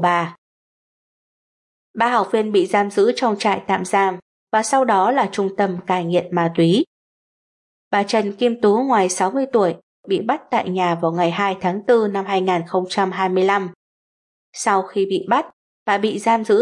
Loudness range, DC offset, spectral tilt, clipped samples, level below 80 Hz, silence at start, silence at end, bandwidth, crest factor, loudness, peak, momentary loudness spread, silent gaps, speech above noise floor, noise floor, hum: 2 LU; under 0.1%; -5 dB/octave; under 0.1%; -72 dBFS; 0 s; 0 s; 11.5 kHz; 16 dB; -19 LUFS; -4 dBFS; 6 LU; 0.38-1.94 s, 4.22-4.47 s, 6.87-7.91 s, 9.83-10.03 s, 13.75-14.53 s, 15.53-15.86 s; over 72 dB; under -90 dBFS; none